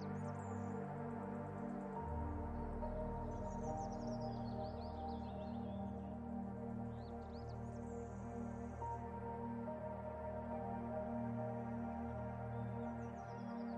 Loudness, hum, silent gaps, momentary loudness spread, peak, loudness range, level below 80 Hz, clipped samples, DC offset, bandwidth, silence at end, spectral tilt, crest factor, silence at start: -46 LUFS; none; none; 4 LU; -32 dBFS; 2 LU; -56 dBFS; under 0.1%; under 0.1%; 9.2 kHz; 0 s; -8.5 dB/octave; 14 dB; 0 s